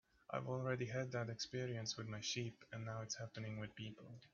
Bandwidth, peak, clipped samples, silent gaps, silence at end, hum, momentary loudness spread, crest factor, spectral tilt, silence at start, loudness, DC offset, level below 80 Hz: 7.2 kHz; -26 dBFS; under 0.1%; none; 0.05 s; none; 8 LU; 20 dB; -4.5 dB/octave; 0.3 s; -46 LUFS; under 0.1%; -76 dBFS